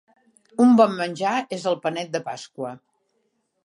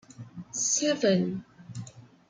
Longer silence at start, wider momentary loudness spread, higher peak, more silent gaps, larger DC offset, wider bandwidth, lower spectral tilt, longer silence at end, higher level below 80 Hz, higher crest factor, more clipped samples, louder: first, 0.6 s vs 0.1 s; second, 18 LU vs 21 LU; first, -4 dBFS vs -12 dBFS; neither; neither; about the same, 11 kHz vs 10 kHz; first, -5.5 dB/octave vs -3.5 dB/octave; first, 0.9 s vs 0.3 s; second, -76 dBFS vs -68 dBFS; about the same, 20 dB vs 18 dB; neither; first, -21 LUFS vs -26 LUFS